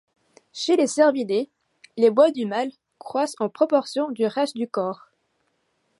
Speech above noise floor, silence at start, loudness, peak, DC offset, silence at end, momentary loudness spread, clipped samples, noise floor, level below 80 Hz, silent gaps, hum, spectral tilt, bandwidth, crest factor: 49 dB; 0.55 s; -22 LUFS; -6 dBFS; under 0.1%; 1.05 s; 13 LU; under 0.1%; -71 dBFS; -78 dBFS; none; none; -4.5 dB/octave; 11.5 kHz; 18 dB